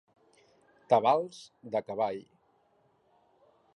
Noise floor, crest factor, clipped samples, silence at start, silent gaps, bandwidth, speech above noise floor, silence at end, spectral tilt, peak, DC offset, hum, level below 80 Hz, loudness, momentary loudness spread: -69 dBFS; 22 dB; under 0.1%; 0.9 s; none; 11.5 kHz; 40 dB; 1.55 s; -5.5 dB/octave; -10 dBFS; under 0.1%; none; -80 dBFS; -30 LUFS; 18 LU